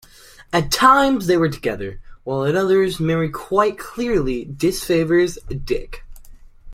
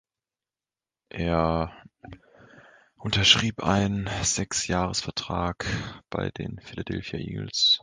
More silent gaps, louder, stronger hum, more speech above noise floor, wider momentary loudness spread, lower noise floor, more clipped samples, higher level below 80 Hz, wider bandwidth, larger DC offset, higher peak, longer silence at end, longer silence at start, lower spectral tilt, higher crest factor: neither; first, -19 LUFS vs -25 LUFS; neither; second, 27 dB vs over 64 dB; second, 12 LU vs 15 LU; second, -45 dBFS vs under -90 dBFS; neither; first, -38 dBFS vs -44 dBFS; first, 16.5 kHz vs 10.5 kHz; neither; about the same, -2 dBFS vs -2 dBFS; about the same, 0 s vs 0.05 s; second, 0.4 s vs 1.15 s; first, -5.5 dB/octave vs -3.5 dB/octave; second, 18 dB vs 26 dB